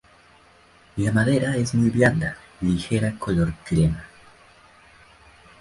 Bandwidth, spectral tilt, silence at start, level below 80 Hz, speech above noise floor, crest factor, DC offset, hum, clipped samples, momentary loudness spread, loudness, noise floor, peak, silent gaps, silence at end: 11.5 kHz; -6.5 dB/octave; 0.95 s; -42 dBFS; 33 dB; 20 dB; under 0.1%; none; under 0.1%; 9 LU; -22 LUFS; -54 dBFS; -4 dBFS; none; 1.55 s